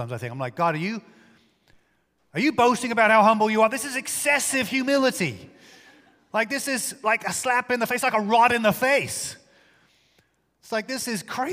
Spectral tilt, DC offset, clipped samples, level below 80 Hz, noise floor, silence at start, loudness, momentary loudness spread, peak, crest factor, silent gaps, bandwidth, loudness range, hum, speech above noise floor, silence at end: -3.5 dB/octave; under 0.1%; under 0.1%; -66 dBFS; -67 dBFS; 0 s; -22 LUFS; 12 LU; -4 dBFS; 20 dB; none; 16 kHz; 4 LU; none; 45 dB; 0 s